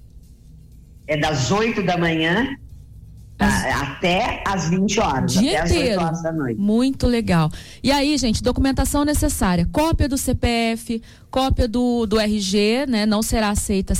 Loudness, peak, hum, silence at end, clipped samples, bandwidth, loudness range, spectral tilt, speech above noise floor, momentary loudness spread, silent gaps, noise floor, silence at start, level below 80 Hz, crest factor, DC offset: -20 LUFS; -8 dBFS; none; 0 s; under 0.1%; 16.5 kHz; 2 LU; -5 dB/octave; 25 dB; 4 LU; none; -44 dBFS; 0.15 s; -30 dBFS; 12 dB; under 0.1%